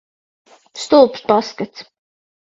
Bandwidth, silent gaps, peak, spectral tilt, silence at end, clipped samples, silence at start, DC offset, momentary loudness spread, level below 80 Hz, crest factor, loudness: 7.8 kHz; none; 0 dBFS; -4.5 dB/octave; 0.6 s; under 0.1%; 0.75 s; under 0.1%; 17 LU; -60 dBFS; 18 dB; -15 LUFS